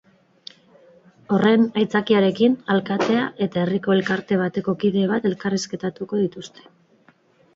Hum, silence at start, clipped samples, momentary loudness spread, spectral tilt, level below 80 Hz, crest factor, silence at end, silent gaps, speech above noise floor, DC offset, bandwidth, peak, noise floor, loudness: none; 1.3 s; under 0.1%; 9 LU; -6 dB/octave; -62 dBFS; 16 dB; 1.1 s; none; 37 dB; under 0.1%; 7.8 kHz; -4 dBFS; -57 dBFS; -21 LUFS